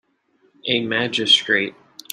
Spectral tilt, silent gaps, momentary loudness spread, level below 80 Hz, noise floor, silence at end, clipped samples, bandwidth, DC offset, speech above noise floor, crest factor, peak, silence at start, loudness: -2.5 dB/octave; none; 12 LU; -66 dBFS; -62 dBFS; 0.4 s; under 0.1%; 14 kHz; under 0.1%; 43 dB; 18 dB; -4 dBFS; 0.65 s; -18 LUFS